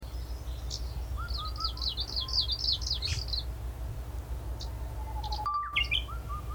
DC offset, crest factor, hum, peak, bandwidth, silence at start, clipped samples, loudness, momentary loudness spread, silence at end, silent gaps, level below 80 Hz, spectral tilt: under 0.1%; 18 dB; none; -16 dBFS; over 20 kHz; 0 s; under 0.1%; -33 LUFS; 12 LU; 0 s; none; -38 dBFS; -3 dB/octave